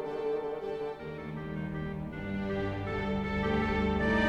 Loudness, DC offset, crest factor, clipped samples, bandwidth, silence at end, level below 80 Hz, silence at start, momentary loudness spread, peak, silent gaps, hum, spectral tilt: -34 LUFS; under 0.1%; 16 dB; under 0.1%; 8.6 kHz; 0 s; -44 dBFS; 0 s; 9 LU; -16 dBFS; none; none; -7.5 dB/octave